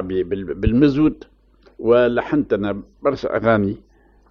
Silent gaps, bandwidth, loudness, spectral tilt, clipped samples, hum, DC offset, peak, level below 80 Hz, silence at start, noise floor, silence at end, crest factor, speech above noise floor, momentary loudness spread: none; 6.4 kHz; -19 LUFS; -9 dB/octave; under 0.1%; none; under 0.1%; -4 dBFS; -38 dBFS; 0 s; -42 dBFS; 0.55 s; 16 dB; 24 dB; 10 LU